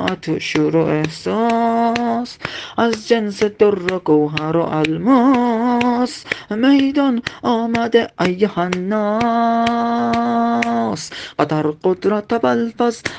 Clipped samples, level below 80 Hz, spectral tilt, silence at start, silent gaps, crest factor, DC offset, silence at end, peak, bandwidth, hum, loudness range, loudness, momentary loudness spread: under 0.1%; -54 dBFS; -6 dB/octave; 0 s; none; 16 dB; under 0.1%; 0 s; 0 dBFS; 9.2 kHz; none; 2 LU; -17 LUFS; 6 LU